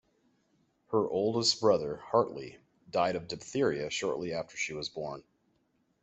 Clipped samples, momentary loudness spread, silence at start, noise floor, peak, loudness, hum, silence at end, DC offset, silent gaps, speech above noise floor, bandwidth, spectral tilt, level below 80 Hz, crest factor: under 0.1%; 12 LU; 0.9 s; -74 dBFS; -12 dBFS; -31 LUFS; none; 0.8 s; under 0.1%; none; 43 dB; 8.2 kHz; -4 dB/octave; -68 dBFS; 20 dB